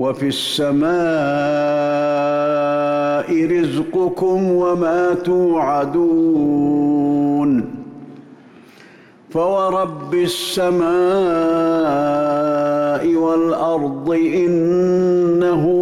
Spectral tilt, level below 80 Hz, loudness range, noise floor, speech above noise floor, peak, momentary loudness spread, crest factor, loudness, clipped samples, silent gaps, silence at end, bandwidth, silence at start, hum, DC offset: -6.5 dB/octave; -54 dBFS; 4 LU; -45 dBFS; 28 dB; -10 dBFS; 4 LU; 8 dB; -17 LUFS; under 0.1%; none; 0 s; 14.5 kHz; 0 s; none; under 0.1%